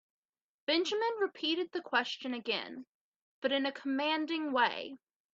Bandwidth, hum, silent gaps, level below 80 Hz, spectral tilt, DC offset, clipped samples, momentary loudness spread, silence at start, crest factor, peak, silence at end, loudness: 7.8 kHz; none; 2.87-3.42 s; -84 dBFS; -2.5 dB/octave; under 0.1%; under 0.1%; 11 LU; 0.7 s; 20 dB; -14 dBFS; 0.4 s; -33 LUFS